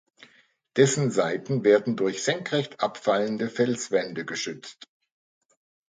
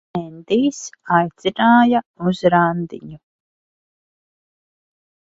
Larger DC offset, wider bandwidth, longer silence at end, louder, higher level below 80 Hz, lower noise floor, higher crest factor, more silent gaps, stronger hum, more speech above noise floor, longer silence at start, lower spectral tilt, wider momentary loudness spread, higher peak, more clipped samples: neither; first, 9.6 kHz vs 7.8 kHz; second, 1.05 s vs 2.15 s; second, -25 LUFS vs -17 LUFS; second, -72 dBFS vs -60 dBFS; second, -62 dBFS vs under -90 dBFS; about the same, 20 dB vs 20 dB; second, none vs 2.06-2.14 s; neither; second, 37 dB vs over 73 dB; first, 0.75 s vs 0.15 s; second, -4.5 dB/octave vs -6 dB/octave; second, 10 LU vs 15 LU; second, -6 dBFS vs 0 dBFS; neither